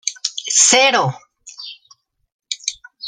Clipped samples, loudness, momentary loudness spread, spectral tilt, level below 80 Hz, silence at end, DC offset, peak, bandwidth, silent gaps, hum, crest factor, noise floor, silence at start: under 0.1%; -14 LUFS; 23 LU; -1 dB/octave; -66 dBFS; 0 s; under 0.1%; 0 dBFS; 13 kHz; 2.32-2.39 s; none; 20 dB; -54 dBFS; 0.05 s